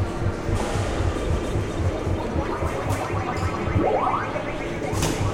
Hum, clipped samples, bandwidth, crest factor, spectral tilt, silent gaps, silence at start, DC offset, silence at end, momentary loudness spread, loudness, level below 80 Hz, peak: none; under 0.1%; 16 kHz; 14 dB; -6 dB/octave; none; 0 s; under 0.1%; 0 s; 5 LU; -25 LUFS; -32 dBFS; -10 dBFS